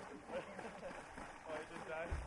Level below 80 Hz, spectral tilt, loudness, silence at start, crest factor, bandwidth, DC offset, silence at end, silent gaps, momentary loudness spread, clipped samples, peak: -56 dBFS; -5 dB/octave; -49 LUFS; 0 s; 16 dB; 11.5 kHz; under 0.1%; 0 s; none; 5 LU; under 0.1%; -32 dBFS